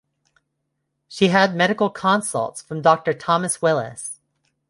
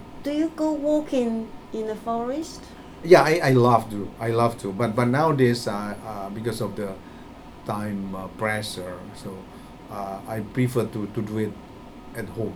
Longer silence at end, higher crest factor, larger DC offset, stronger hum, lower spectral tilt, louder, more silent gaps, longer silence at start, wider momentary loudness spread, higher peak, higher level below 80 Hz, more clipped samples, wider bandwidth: first, 0.55 s vs 0 s; about the same, 20 dB vs 24 dB; neither; neither; second, -4.5 dB/octave vs -6.5 dB/octave; first, -20 LUFS vs -24 LUFS; neither; first, 1.1 s vs 0 s; second, 15 LU vs 20 LU; about the same, -2 dBFS vs -2 dBFS; second, -64 dBFS vs -50 dBFS; neither; second, 11.5 kHz vs 18.5 kHz